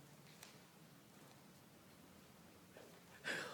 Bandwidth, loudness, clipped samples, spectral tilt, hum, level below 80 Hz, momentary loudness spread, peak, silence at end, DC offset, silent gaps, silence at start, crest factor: 19 kHz; -56 LUFS; under 0.1%; -2.5 dB/octave; none; -84 dBFS; 15 LU; -32 dBFS; 0 s; under 0.1%; none; 0 s; 24 dB